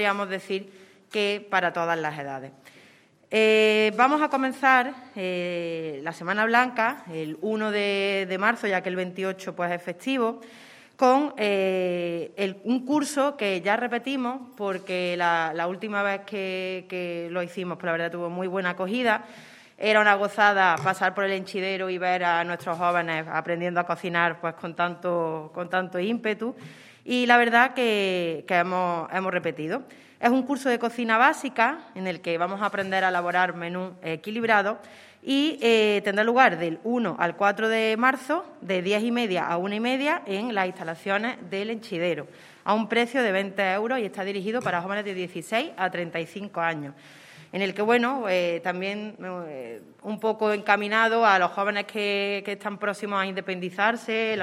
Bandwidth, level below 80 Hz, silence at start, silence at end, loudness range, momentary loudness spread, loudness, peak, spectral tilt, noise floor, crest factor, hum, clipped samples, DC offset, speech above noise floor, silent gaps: 15 kHz; -82 dBFS; 0 s; 0 s; 5 LU; 12 LU; -25 LUFS; -2 dBFS; -5 dB/octave; -56 dBFS; 24 dB; none; under 0.1%; under 0.1%; 31 dB; none